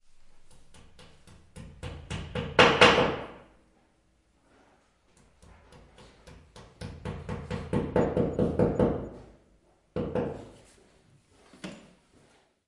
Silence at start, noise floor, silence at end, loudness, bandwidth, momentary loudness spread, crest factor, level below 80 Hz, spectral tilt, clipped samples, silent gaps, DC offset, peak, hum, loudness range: 0.35 s; -67 dBFS; 0.9 s; -26 LUFS; 11.5 kHz; 25 LU; 28 dB; -50 dBFS; -5 dB/octave; under 0.1%; none; under 0.1%; -4 dBFS; none; 14 LU